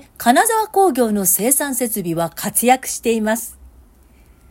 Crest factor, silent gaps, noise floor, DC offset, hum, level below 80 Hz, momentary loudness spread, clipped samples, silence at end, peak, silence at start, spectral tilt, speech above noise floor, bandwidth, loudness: 18 dB; none; -48 dBFS; under 0.1%; none; -50 dBFS; 7 LU; under 0.1%; 0.85 s; 0 dBFS; 0.2 s; -3 dB/octave; 32 dB; 16.5 kHz; -16 LUFS